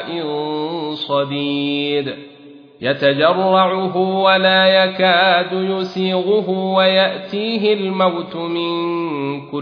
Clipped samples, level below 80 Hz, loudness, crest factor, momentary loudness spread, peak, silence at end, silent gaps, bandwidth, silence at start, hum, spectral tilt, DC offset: under 0.1%; -66 dBFS; -16 LUFS; 16 dB; 11 LU; -2 dBFS; 0 s; none; 5.4 kHz; 0 s; none; -7 dB/octave; under 0.1%